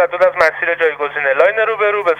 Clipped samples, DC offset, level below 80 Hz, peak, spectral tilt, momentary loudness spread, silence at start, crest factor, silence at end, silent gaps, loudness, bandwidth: under 0.1%; under 0.1%; -56 dBFS; 0 dBFS; -3.5 dB/octave; 4 LU; 0 s; 14 dB; 0 s; none; -14 LUFS; 9.4 kHz